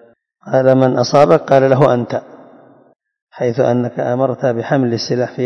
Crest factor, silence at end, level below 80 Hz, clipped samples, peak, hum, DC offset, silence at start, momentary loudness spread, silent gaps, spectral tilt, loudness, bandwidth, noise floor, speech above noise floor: 14 dB; 0 s; -56 dBFS; 0.4%; 0 dBFS; none; under 0.1%; 0.45 s; 8 LU; 3.22-3.27 s; -7 dB/octave; -14 LUFS; 7.6 kHz; -44 dBFS; 31 dB